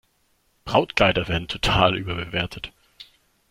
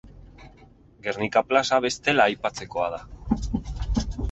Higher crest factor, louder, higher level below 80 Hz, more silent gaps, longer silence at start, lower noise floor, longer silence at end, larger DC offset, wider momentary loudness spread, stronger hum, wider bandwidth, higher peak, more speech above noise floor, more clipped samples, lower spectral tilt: about the same, 24 dB vs 22 dB; first, -22 LUFS vs -25 LUFS; about the same, -40 dBFS vs -36 dBFS; neither; first, 0.65 s vs 0.05 s; first, -66 dBFS vs -52 dBFS; first, 0.45 s vs 0 s; neither; first, 16 LU vs 11 LU; neither; first, 15 kHz vs 8.2 kHz; first, 0 dBFS vs -4 dBFS; first, 44 dB vs 28 dB; neither; about the same, -5 dB/octave vs -4.5 dB/octave